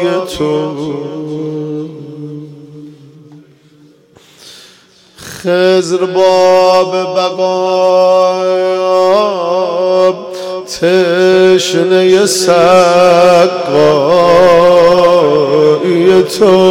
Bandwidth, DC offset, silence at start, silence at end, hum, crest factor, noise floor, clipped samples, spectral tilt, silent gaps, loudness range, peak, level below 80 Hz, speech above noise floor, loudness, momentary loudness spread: 16 kHz; under 0.1%; 0 s; 0 s; none; 10 dB; -44 dBFS; under 0.1%; -4.5 dB/octave; none; 15 LU; 0 dBFS; -48 dBFS; 35 dB; -9 LUFS; 14 LU